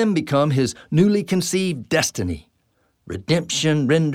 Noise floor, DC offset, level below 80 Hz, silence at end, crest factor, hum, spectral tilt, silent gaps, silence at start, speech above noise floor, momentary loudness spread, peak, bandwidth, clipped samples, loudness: -66 dBFS; under 0.1%; -50 dBFS; 0 s; 16 dB; none; -5 dB/octave; none; 0 s; 46 dB; 10 LU; -4 dBFS; 16 kHz; under 0.1%; -20 LUFS